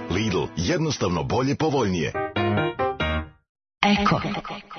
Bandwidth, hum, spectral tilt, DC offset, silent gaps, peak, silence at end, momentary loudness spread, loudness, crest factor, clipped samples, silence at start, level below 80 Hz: 6.6 kHz; none; -5.5 dB/octave; under 0.1%; 3.49-3.55 s; -4 dBFS; 0 s; 6 LU; -24 LUFS; 20 dB; under 0.1%; 0 s; -44 dBFS